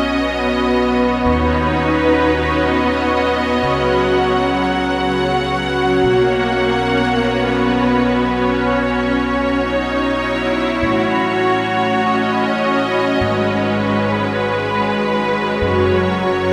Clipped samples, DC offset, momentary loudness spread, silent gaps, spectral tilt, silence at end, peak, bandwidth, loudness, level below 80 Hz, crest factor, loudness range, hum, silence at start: under 0.1%; under 0.1%; 3 LU; none; -6.5 dB/octave; 0 s; -2 dBFS; 11.5 kHz; -16 LUFS; -32 dBFS; 14 dB; 1 LU; none; 0 s